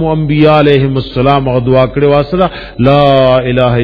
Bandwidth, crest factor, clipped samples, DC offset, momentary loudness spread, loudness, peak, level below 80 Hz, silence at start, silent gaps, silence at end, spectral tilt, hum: 5.4 kHz; 8 dB; 0.9%; under 0.1%; 6 LU; -9 LUFS; 0 dBFS; -30 dBFS; 0 s; none; 0 s; -9.5 dB/octave; none